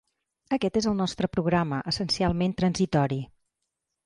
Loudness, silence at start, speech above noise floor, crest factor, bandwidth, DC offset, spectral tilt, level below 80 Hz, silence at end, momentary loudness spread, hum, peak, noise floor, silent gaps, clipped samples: -26 LUFS; 0.5 s; 57 dB; 14 dB; 11 kHz; under 0.1%; -6 dB/octave; -50 dBFS; 0.8 s; 4 LU; none; -12 dBFS; -83 dBFS; none; under 0.1%